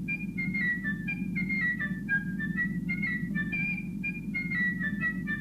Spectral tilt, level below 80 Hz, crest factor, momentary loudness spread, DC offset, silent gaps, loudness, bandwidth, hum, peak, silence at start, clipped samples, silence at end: -7.5 dB/octave; -52 dBFS; 12 dB; 5 LU; under 0.1%; none; -30 LUFS; 14 kHz; none; -18 dBFS; 0 s; under 0.1%; 0 s